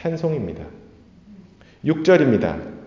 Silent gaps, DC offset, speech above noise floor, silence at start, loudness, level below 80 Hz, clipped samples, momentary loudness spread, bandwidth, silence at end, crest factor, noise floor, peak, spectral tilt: none; under 0.1%; 27 dB; 0 s; -20 LUFS; -48 dBFS; under 0.1%; 18 LU; 7.4 kHz; 0 s; 18 dB; -47 dBFS; -2 dBFS; -7.5 dB/octave